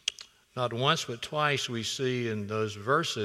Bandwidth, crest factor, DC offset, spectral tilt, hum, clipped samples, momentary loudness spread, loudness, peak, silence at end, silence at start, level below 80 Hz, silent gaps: 15.5 kHz; 24 dB; under 0.1%; -4 dB/octave; none; under 0.1%; 7 LU; -30 LUFS; -6 dBFS; 0 s; 0.05 s; -70 dBFS; none